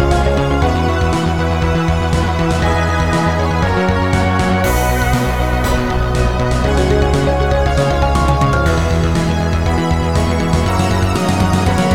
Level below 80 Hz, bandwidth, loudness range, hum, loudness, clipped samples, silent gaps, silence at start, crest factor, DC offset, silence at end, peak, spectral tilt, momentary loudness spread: -20 dBFS; 17 kHz; 1 LU; none; -15 LUFS; under 0.1%; none; 0 s; 14 dB; 1%; 0 s; 0 dBFS; -6 dB/octave; 2 LU